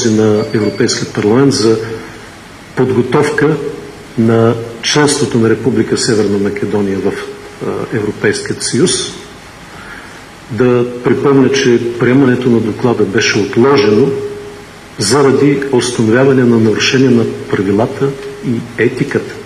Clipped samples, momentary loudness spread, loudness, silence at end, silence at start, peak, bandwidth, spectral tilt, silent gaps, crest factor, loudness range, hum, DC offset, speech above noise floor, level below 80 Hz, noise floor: under 0.1%; 18 LU; -12 LUFS; 0 s; 0 s; 0 dBFS; 13 kHz; -5 dB/octave; none; 12 dB; 5 LU; none; under 0.1%; 22 dB; -46 dBFS; -33 dBFS